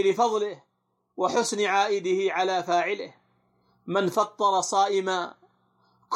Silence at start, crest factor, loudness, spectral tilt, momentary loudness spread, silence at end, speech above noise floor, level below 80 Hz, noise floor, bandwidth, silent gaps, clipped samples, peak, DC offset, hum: 0 s; 16 dB; -25 LUFS; -3.5 dB/octave; 12 LU; 0 s; 42 dB; -80 dBFS; -67 dBFS; 14.5 kHz; none; under 0.1%; -10 dBFS; under 0.1%; none